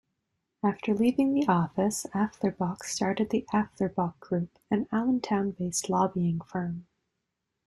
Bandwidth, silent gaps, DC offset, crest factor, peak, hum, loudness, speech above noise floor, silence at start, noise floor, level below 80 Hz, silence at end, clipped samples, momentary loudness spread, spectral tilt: 13 kHz; none; under 0.1%; 18 dB; -10 dBFS; none; -29 LUFS; 55 dB; 0.65 s; -83 dBFS; -62 dBFS; 0.85 s; under 0.1%; 7 LU; -5.5 dB/octave